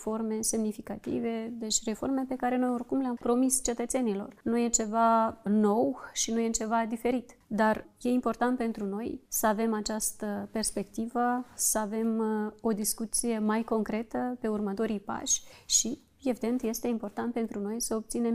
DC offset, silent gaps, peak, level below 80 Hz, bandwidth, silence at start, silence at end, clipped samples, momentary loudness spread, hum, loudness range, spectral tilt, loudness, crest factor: under 0.1%; none; -12 dBFS; -56 dBFS; 15.5 kHz; 0 s; 0 s; under 0.1%; 8 LU; none; 3 LU; -3.5 dB/octave; -30 LUFS; 18 dB